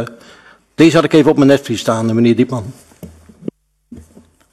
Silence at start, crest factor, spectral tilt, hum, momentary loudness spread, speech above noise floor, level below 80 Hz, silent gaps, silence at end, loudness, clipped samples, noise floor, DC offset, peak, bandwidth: 0 s; 14 dB; -6 dB/octave; none; 21 LU; 34 dB; -50 dBFS; none; 0.55 s; -12 LUFS; under 0.1%; -46 dBFS; under 0.1%; 0 dBFS; 13 kHz